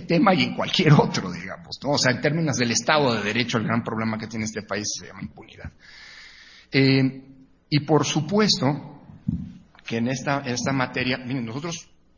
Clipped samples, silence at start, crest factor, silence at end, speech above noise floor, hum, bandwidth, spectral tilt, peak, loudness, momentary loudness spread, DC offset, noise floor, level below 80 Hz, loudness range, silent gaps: under 0.1%; 0 s; 22 dB; 0.35 s; 25 dB; none; 7.4 kHz; -4.5 dB/octave; -2 dBFS; -23 LUFS; 21 LU; under 0.1%; -48 dBFS; -52 dBFS; 6 LU; none